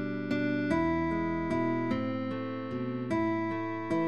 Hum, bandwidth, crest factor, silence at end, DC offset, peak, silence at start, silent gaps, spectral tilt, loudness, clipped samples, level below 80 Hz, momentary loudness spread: none; 8.6 kHz; 14 dB; 0 s; 0.3%; -16 dBFS; 0 s; none; -8 dB/octave; -31 LUFS; under 0.1%; -54 dBFS; 6 LU